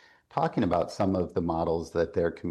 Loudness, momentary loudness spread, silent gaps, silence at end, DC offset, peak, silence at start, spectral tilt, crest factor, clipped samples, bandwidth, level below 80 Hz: -29 LUFS; 3 LU; none; 0 s; under 0.1%; -12 dBFS; 0.35 s; -7.5 dB/octave; 16 dB; under 0.1%; 12 kHz; -56 dBFS